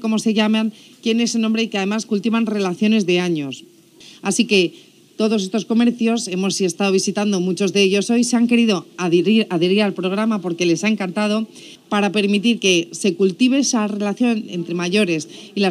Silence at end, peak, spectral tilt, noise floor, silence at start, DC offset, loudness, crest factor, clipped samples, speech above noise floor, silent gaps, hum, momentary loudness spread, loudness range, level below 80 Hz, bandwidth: 0 s; -4 dBFS; -4.5 dB/octave; -45 dBFS; 0 s; under 0.1%; -18 LUFS; 14 dB; under 0.1%; 27 dB; none; none; 7 LU; 3 LU; -74 dBFS; 13 kHz